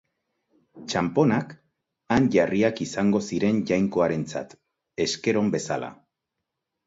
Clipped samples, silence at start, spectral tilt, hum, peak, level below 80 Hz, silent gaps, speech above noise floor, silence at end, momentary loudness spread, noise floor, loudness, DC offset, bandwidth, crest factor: under 0.1%; 0.75 s; -5.5 dB/octave; none; -8 dBFS; -56 dBFS; none; 60 dB; 0.95 s; 14 LU; -83 dBFS; -24 LUFS; under 0.1%; 8 kHz; 18 dB